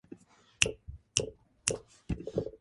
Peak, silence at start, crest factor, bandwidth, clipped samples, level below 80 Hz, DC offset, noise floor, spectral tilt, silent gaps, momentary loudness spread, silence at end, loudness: -2 dBFS; 0.1 s; 34 dB; 11.5 kHz; under 0.1%; -50 dBFS; under 0.1%; -54 dBFS; -2.5 dB/octave; none; 19 LU; 0.05 s; -34 LUFS